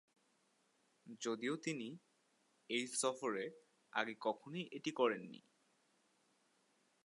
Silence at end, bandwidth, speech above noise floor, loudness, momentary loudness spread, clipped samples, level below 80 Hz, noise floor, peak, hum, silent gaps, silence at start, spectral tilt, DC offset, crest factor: 1.65 s; 11.5 kHz; 37 dB; -42 LUFS; 14 LU; under 0.1%; under -90 dBFS; -78 dBFS; -22 dBFS; none; none; 1.05 s; -3 dB/octave; under 0.1%; 24 dB